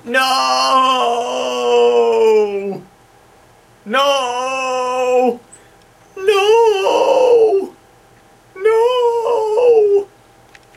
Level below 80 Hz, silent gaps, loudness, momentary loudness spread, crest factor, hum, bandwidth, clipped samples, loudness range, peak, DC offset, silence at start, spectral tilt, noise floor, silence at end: -60 dBFS; none; -14 LUFS; 8 LU; 14 dB; none; 15 kHz; under 0.1%; 4 LU; -2 dBFS; under 0.1%; 0.05 s; -2.5 dB/octave; -47 dBFS; 0.7 s